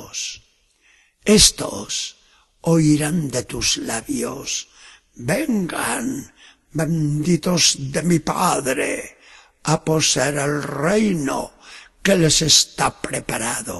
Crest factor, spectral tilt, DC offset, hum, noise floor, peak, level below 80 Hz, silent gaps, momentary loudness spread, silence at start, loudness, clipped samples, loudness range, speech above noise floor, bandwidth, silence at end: 20 dB; -3.5 dB/octave; under 0.1%; none; -59 dBFS; 0 dBFS; -44 dBFS; none; 14 LU; 0 s; -19 LUFS; under 0.1%; 5 LU; 39 dB; 12.5 kHz; 0 s